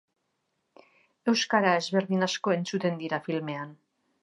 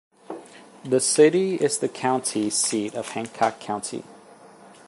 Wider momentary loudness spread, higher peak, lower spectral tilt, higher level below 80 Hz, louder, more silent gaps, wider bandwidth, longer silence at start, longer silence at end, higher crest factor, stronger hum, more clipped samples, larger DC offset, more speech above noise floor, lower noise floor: second, 10 LU vs 22 LU; second, -8 dBFS vs -4 dBFS; about the same, -4.5 dB/octave vs -3.5 dB/octave; second, -82 dBFS vs -72 dBFS; second, -28 LUFS vs -23 LUFS; neither; about the same, 11 kHz vs 11.5 kHz; first, 1.25 s vs 0.3 s; about the same, 0.5 s vs 0.4 s; about the same, 20 dB vs 20 dB; neither; neither; neither; first, 51 dB vs 25 dB; first, -78 dBFS vs -48 dBFS